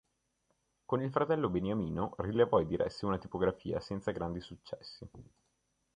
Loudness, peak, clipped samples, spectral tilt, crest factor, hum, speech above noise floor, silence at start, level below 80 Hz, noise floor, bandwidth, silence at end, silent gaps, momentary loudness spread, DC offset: -34 LUFS; -14 dBFS; under 0.1%; -8 dB/octave; 22 dB; none; 45 dB; 0.9 s; -56 dBFS; -79 dBFS; 9.6 kHz; 0.7 s; none; 17 LU; under 0.1%